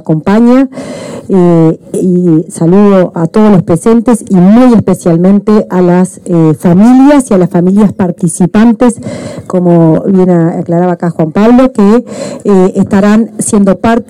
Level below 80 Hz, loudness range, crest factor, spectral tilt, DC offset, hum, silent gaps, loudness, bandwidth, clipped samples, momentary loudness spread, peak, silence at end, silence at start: -38 dBFS; 2 LU; 6 dB; -7.5 dB/octave; under 0.1%; none; none; -7 LUFS; 13 kHz; 2%; 7 LU; 0 dBFS; 0.05 s; 0.05 s